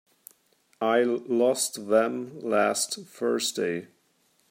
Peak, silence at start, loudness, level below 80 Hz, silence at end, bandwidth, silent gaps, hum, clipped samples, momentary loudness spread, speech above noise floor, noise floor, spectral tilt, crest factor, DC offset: -8 dBFS; 0.8 s; -26 LUFS; -80 dBFS; 0.65 s; 16 kHz; none; none; under 0.1%; 7 LU; 42 dB; -68 dBFS; -3 dB/octave; 20 dB; under 0.1%